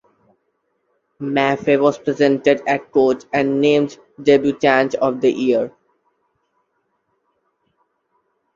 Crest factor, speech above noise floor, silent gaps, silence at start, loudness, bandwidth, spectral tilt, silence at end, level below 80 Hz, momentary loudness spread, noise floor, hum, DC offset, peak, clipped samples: 18 dB; 53 dB; none; 1.2 s; -17 LUFS; 7.4 kHz; -6 dB/octave; 2.85 s; -62 dBFS; 6 LU; -69 dBFS; none; under 0.1%; -2 dBFS; under 0.1%